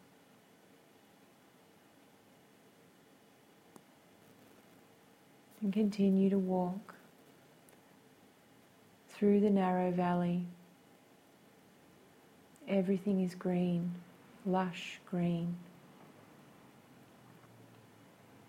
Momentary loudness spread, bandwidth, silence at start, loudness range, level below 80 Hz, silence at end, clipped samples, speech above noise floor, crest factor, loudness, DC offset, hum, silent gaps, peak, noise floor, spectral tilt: 27 LU; 13.5 kHz; 5.6 s; 6 LU; -76 dBFS; 2.8 s; under 0.1%; 31 dB; 20 dB; -34 LUFS; under 0.1%; none; none; -18 dBFS; -63 dBFS; -8 dB/octave